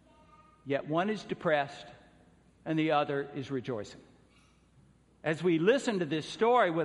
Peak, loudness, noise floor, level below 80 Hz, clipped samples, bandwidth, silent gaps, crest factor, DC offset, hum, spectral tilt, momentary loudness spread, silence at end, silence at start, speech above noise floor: -12 dBFS; -31 LUFS; -64 dBFS; -70 dBFS; under 0.1%; 11 kHz; none; 20 dB; under 0.1%; none; -6 dB/octave; 15 LU; 0 s; 0.65 s; 33 dB